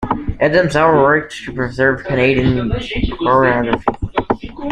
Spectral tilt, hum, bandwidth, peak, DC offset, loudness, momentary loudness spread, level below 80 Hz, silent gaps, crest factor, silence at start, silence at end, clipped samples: -7 dB/octave; none; 10.5 kHz; 0 dBFS; under 0.1%; -15 LUFS; 9 LU; -32 dBFS; none; 14 dB; 0 s; 0 s; under 0.1%